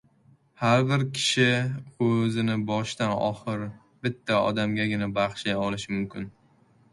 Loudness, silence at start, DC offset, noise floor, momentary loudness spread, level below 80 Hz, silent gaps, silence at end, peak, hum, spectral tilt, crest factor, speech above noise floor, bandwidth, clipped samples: -26 LUFS; 0.6 s; under 0.1%; -61 dBFS; 11 LU; -60 dBFS; none; 0.6 s; -8 dBFS; none; -5.5 dB/octave; 18 dB; 35 dB; 11.5 kHz; under 0.1%